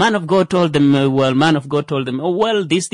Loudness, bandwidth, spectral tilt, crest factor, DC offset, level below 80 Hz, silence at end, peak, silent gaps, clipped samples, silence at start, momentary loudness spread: -16 LUFS; 11 kHz; -5.5 dB/octave; 12 dB; under 0.1%; -54 dBFS; 0.05 s; -4 dBFS; none; under 0.1%; 0 s; 6 LU